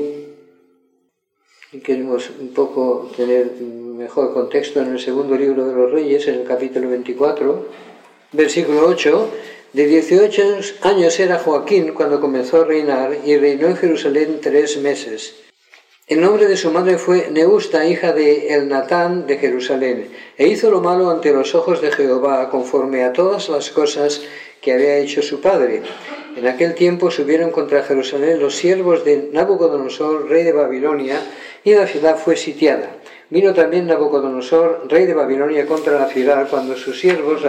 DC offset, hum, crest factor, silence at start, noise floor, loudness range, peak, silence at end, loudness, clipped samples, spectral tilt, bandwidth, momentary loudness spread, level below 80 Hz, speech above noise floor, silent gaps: under 0.1%; none; 14 dB; 0 s; -66 dBFS; 3 LU; -2 dBFS; 0 s; -16 LUFS; under 0.1%; -5 dB/octave; 9.2 kHz; 9 LU; -66 dBFS; 51 dB; none